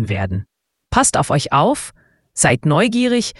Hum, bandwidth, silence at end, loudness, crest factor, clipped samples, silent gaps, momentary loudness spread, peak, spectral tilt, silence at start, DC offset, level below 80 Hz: none; 12 kHz; 0.1 s; -16 LUFS; 18 dB; under 0.1%; none; 11 LU; 0 dBFS; -4.5 dB/octave; 0 s; under 0.1%; -40 dBFS